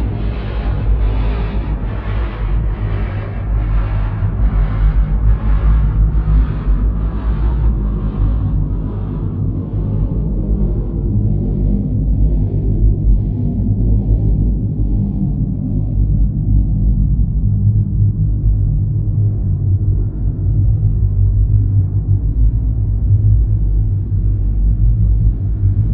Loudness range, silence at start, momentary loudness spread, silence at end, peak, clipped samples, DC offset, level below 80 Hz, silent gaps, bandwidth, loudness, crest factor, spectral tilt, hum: 3 LU; 0 s; 5 LU; 0 s; -2 dBFS; under 0.1%; under 0.1%; -16 dBFS; none; 3.6 kHz; -17 LUFS; 12 dB; -12.5 dB/octave; none